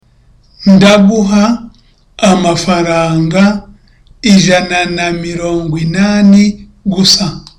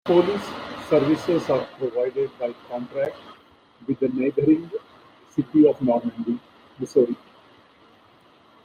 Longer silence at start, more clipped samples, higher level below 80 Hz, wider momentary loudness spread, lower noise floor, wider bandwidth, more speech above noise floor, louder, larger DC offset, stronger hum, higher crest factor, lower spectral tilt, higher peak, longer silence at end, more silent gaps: first, 0.6 s vs 0.05 s; neither; first, -36 dBFS vs -64 dBFS; second, 9 LU vs 15 LU; second, -46 dBFS vs -55 dBFS; first, 13.5 kHz vs 9.8 kHz; first, 37 dB vs 33 dB; first, -9 LUFS vs -23 LUFS; neither; neither; second, 10 dB vs 18 dB; second, -5 dB/octave vs -7.5 dB/octave; first, 0 dBFS vs -6 dBFS; second, 0.2 s vs 1.5 s; neither